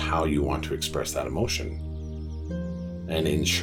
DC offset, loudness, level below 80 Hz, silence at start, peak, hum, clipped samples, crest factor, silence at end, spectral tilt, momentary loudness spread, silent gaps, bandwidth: under 0.1%; -29 LUFS; -36 dBFS; 0 s; -12 dBFS; none; under 0.1%; 16 dB; 0 s; -4.5 dB/octave; 11 LU; none; 18.5 kHz